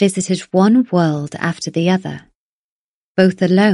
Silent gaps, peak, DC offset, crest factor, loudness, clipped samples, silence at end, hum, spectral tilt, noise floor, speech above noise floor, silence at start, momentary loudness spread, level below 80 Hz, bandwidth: 2.35-3.15 s; 0 dBFS; under 0.1%; 14 dB; -16 LUFS; under 0.1%; 0 s; none; -6 dB/octave; under -90 dBFS; over 75 dB; 0 s; 10 LU; -60 dBFS; 11.5 kHz